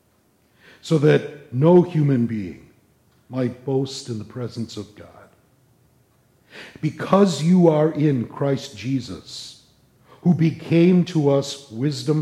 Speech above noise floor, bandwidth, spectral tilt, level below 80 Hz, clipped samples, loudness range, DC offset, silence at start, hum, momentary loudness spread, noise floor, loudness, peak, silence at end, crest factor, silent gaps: 42 dB; 11.5 kHz; -7.5 dB/octave; -62 dBFS; under 0.1%; 9 LU; under 0.1%; 0.85 s; none; 18 LU; -61 dBFS; -20 LUFS; -4 dBFS; 0 s; 18 dB; none